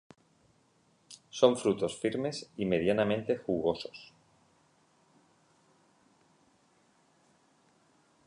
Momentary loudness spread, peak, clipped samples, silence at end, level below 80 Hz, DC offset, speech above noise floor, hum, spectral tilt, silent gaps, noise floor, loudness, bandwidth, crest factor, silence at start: 18 LU; -8 dBFS; under 0.1%; 4.2 s; -66 dBFS; under 0.1%; 39 dB; none; -5.5 dB/octave; none; -69 dBFS; -31 LUFS; 11 kHz; 26 dB; 1.1 s